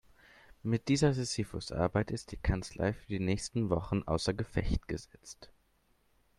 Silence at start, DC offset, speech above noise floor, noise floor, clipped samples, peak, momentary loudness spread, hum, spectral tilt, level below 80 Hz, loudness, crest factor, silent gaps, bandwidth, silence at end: 0.65 s; under 0.1%; 38 dB; -71 dBFS; under 0.1%; -14 dBFS; 13 LU; none; -6 dB/octave; -46 dBFS; -34 LUFS; 20 dB; none; 12.5 kHz; 0.95 s